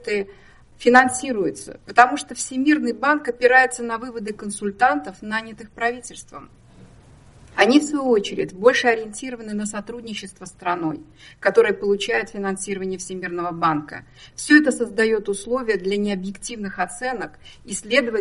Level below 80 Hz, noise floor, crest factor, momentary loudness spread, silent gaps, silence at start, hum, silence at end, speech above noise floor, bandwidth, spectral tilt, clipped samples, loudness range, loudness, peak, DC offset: -54 dBFS; -48 dBFS; 22 dB; 16 LU; none; 0 s; none; 0 s; 27 dB; 11.5 kHz; -3.5 dB/octave; under 0.1%; 5 LU; -21 LUFS; 0 dBFS; under 0.1%